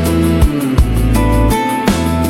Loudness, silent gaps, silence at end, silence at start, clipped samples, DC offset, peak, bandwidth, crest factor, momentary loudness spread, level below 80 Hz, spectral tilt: -13 LUFS; none; 0 s; 0 s; under 0.1%; under 0.1%; 0 dBFS; 16.5 kHz; 12 dB; 2 LU; -16 dBFS; -6.5 dB/octave